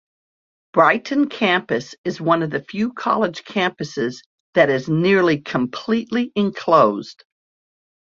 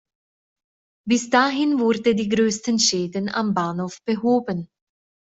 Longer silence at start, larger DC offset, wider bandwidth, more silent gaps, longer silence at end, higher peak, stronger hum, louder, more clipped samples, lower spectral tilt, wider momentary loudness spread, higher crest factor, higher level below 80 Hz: second, 0.75 s vs 1.05 s; neither; about the same, 7.6 kHz vs 8.2 kHz; first, 1.98-2.04 s, 4.26-4.53 s vs none; first, 1 s vs 0.65 s; about the same, -2 dBFS vs -4 dBFS; neither; about the same, -19 LUFS vs -21 LUFS; neither; first, -6 dB/octave vs -4 dB/octave; about the same, 9 LU vs 8 LU; about the same, 18 dB vs 20 dB; about the same, -62 dBFS vs -62 dBFS